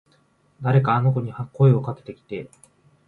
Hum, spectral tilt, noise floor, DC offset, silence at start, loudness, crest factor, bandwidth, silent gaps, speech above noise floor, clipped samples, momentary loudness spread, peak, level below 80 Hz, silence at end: none; -9.5 dB/octave; -61 dBFS; under 0.1%; 0.6 s; -21 LUFS; 18 dB; 4.3 kHz; none; 41 dB; under 0.1%; 17 LU; -6 dBFS; -58 dBFS; 0.6 s